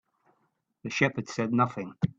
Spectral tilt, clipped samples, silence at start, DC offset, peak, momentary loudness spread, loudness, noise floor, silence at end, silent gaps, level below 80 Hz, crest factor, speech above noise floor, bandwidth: -6 dB/octave; under 0.1%; 0.85 s; under 0.1%; -10 dBFS; 8 LU; -28 LUFS; -75 dBFS; 0.1 s; none; -66 dBFS; 22 dB; 46 dB; 7.8 kHz